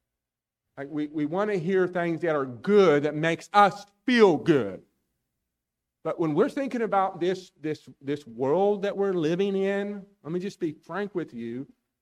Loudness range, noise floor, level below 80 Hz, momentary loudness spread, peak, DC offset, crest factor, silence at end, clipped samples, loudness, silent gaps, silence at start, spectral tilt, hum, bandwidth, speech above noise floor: 6 LU; -88 dBFS; -72 dBFS; 15 LU; -6 dBFS; under 0.1%; 20 dB; 0.35 s; under 0.1%; -26 LUFS; none; 0.75 s; -6.5 dB/octave; none; 10.5 kHz; 63 dB